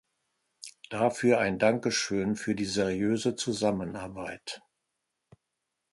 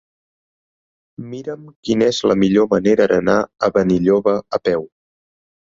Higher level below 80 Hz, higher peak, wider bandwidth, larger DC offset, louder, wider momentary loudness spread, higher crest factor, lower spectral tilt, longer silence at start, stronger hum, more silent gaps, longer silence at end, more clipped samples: second, -62 dBFS vs -50 dBFS; second, -8 dBFS vs -2 dBFS; first, 11.5 kHz vs 7.6 kHz; neither; second, -29 LUFS vs -16 LUFS; about the same, 16 LU vs 15 LU; first, 22 dB vs 16 dB; second, -4.5 dB/octave vs -6 dB/octave; second, 0.6 s vs 1.2 s; neither; second, none vs 1.76-1.83 s; first, 1.35 s vs 0.95 s; neither